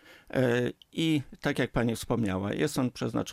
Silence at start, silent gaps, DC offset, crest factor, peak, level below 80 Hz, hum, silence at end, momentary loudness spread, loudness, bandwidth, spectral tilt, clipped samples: 0.1 s; none; under 0.1%; 16 dB; -14 dBFS; -52 dBFS; none; 0 s; 5 LU; -30 LUFS; 16 kHz; -6 dB/octave; under 0.1%